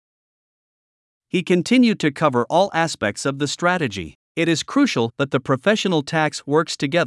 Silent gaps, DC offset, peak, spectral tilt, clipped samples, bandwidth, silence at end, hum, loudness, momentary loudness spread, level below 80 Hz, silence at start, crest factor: 4.15-4.35 s; under 0.1%; -4 dBFS; -5 dB/octave; under 0.1%; 12 kHz; 0 s; none; -20 LUFS; 6 LU; -62 dBFS; 1.35 s; 18 dB